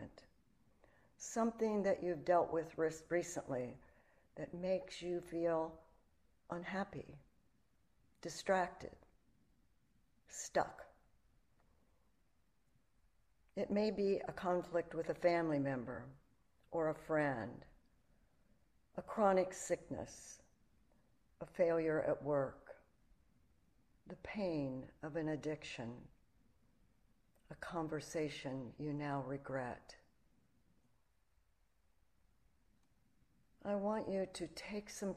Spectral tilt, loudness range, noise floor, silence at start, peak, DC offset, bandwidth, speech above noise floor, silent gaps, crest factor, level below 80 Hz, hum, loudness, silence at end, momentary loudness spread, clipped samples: -5.5 dB/octave; 9 LU; -79 dBFS; 0 s; -20 dBFS; under 0.1%; 14 kHz; 39 dB; none; 22 dB; -70 dBFS; none; -40 LUFS; 0 s; 17 LU; under 0.1%